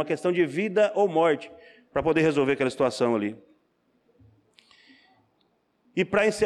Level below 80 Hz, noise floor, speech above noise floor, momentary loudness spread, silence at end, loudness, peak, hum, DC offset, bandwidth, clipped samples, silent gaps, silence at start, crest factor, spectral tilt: -62 dBFS; -69 dBFS; 46 dB; 9 LU; 0 s; -25 LUFS; -12 dBFS; none; under 0.1%; 12 kHz; under 0.1%; none; 0 s; 14 dB; -5.5 dB/octave